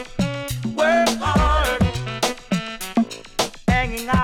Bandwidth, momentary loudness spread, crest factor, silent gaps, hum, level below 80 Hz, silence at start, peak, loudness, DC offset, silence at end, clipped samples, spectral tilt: 17.5 kHz; 8 LU; 12 dB; none; none; -30 dBFS; 0 s; -8 dBFS; -21 LUFS; under 0.1%; 0 s; under 0.1%; -5 dB/octave